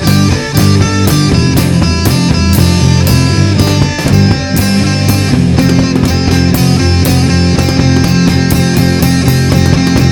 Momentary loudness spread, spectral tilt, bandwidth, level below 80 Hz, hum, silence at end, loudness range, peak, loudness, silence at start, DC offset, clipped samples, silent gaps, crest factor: 2 LU; -5.5 dB/octave; 19 kHz; -22 dBFS; none; 0 s; 1 LU; 0 dBFS; -9 LUFS; 0 s; under 0.1%; 0.5%; none; 8 dB